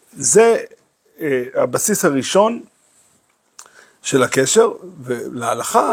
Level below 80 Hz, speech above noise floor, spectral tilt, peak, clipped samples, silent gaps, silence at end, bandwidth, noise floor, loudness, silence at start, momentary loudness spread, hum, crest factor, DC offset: -66 dBFS; 44 dB; -3.5 dB/octave; 0 dBFS; under 0.1%; none; 0 s; 16.5 kHz; -60 dBFS; -17 LUFS; 0.15 s; 14 LU; none; 18 dB; under 0.1%